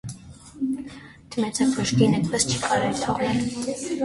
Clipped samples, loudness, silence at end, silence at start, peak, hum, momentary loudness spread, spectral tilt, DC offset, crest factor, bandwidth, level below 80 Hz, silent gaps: under 0.1%; -24 LUFS; 0 s; 0.05 s; -6 dBFS; none; 16 LU; -4.5 dB/octave; under 0.1%; 18 dB; 11.5 kHz; -52 dBFS; none